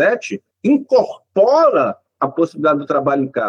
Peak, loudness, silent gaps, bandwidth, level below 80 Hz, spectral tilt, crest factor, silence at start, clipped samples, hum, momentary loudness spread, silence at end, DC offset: -4 dBFS; -16 LUFS; none; 7.6 kHz; -72 dBFS; -6.5 dB/octave; 12 dB; 0 s; under 0.1%; none; 10 LU; 0 s; under 0.1%